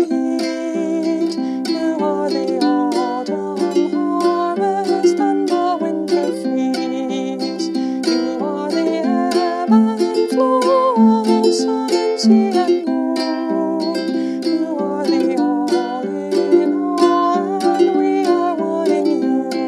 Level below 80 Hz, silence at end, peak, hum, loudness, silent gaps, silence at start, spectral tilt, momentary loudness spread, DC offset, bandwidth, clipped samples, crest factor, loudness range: -70 dBFS; 0 s; -2 dBFS; none; -17 LUFS; none; 0 s; -5.5 dB/octave; 7 LU; under 0.1%; 12 kHz; under 0.1%; 16 dB; 4 LU